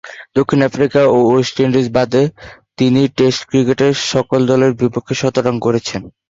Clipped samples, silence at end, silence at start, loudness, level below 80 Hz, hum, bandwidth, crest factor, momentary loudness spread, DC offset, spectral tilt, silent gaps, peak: under 0.1%; 0.2 s; 0.05 s; -14 LUFS; -48 dBFS; none; 7.8 kHz; 14 dB; 6 LU; under 0.1%; -6 dB/octave; none; 0 dBFS